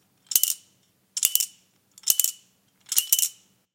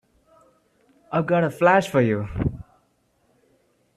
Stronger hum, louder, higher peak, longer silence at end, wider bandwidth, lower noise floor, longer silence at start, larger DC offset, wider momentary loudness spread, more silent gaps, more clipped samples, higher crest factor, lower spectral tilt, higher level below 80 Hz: neither; about the same, -23 LUFS vs -21 LUFS; first, 0 dBFS vs -4 dBFS; second, 0.45 s vs 1.35 s; first, 17.5 kHz vs 14 kHz; about the same, -65 dBFS vs -66 dBFS; second, 0.3 s vs 1.1 s; neither; about the same, 10 LU vs 10 LU; neither; neither; first, 28 dB vs 20 dB; second, 4 dB/octave vs -7 dB/octave; second, -74 dBFS vs -46 dBFS